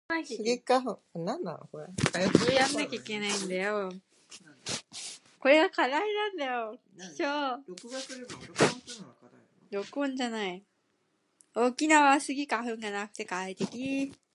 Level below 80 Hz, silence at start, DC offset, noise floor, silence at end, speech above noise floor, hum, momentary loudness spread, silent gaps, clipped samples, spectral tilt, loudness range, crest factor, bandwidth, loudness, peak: -66 dBFS; 0.1 s; under 0.1%; -74 dBFS; 0.2 s; 45 dB; none; 17 LU; none; under 0.1%; -4 dB/octave; 5 LU; 26 dB; 11.5 kHz; -29 LUFS; -4 dBFS